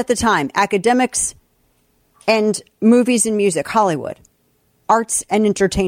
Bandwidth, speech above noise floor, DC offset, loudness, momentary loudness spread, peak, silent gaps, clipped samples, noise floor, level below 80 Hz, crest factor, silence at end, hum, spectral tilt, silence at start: 16.5 kHz; 45 dB; under 0.1%; -17 LUFS; 10 LU; -2 dBFS; none; under 0.1%; -61 dBFS; -44 dBFS; 16 dB; 0 s; none; -4 dB/octave; 0 s